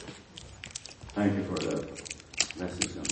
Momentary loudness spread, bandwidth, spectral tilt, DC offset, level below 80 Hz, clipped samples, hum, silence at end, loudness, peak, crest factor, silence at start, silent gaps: 15 LU; 8.8 kHz; -3.5 dB/octave; under 0.1%; -56 dBFS; under 0.1%; none; 0 s; -33 LUFS; -6 dBFS; 28 dB; 0 s; none